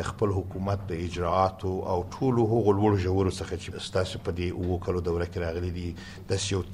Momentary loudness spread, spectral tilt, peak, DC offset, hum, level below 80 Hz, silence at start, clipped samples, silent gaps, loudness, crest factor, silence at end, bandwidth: 10 LU; -6.5 dB/octave; -10 dBFS; under 0.1%; none; -46 dBFS; 0 s; under 0.1%; none; -28 LUFS; 18 dB; 0 s; 11.5 kHz